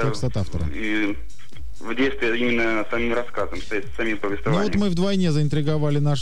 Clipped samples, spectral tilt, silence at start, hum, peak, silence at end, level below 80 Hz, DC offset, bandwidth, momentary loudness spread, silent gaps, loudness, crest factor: under 0.1%; -6.5 dB/octave; 0 s; none; -10 dBFS; 0 s; -40 dBFS; 6%; 11 kHz; 8 LU; none; -23 LUFS; 12 dB